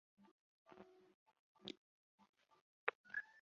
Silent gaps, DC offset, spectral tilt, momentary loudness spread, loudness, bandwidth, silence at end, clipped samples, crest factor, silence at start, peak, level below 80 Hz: 0.31-0.66 s, 1.14-1.26 s, 1.39-1.55 s, 1.77-2.18 s, 2.29-2.33 s, 2.61-2.87 s, 2.95-3.04 s; under 0.1%; 0 dB/octave; 19 LU; -50 LUFS; 6.8 kHz; 0 s; under 0.1%; 38 dB; 0.2 s; -18 dBFS; under -90 dBFS